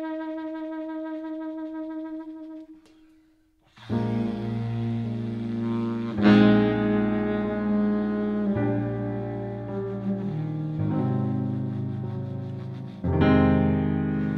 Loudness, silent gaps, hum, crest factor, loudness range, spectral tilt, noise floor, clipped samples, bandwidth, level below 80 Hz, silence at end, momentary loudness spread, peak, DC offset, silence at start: -26 LUFS; none; none; 20 dB; 12 LU; -9.5 dB/octave; -62 dBFS; under 0.1%; 5.8 kHz; -48 dBFS; 0 s; 14 LU; -6 dBFS; under 0.1%; 0 s